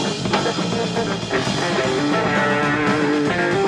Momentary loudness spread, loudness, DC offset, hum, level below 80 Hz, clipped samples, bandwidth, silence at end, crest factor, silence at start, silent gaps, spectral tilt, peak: 4 LU; -19 LUFS; under 0.1%; none; -48 dBFS; under 0.1%; 11.5 kHz; 0 s; 16 dB; 0 s; none; -5 dB/octave; -4 dBFS